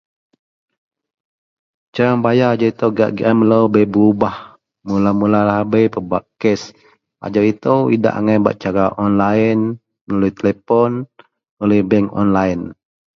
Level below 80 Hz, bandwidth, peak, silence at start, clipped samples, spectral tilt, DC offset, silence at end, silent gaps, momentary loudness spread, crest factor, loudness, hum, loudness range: -48 dBFS; 6.8 kHz; 0 dBFS; 1.95 s; under 0.1%; -8 dB/octave; under 0.1%; 0.4 s; 10.01-10.07 s, 11.49-11.57 s; 9 LU; 16 dB; -16 LUFS; none; 3 LU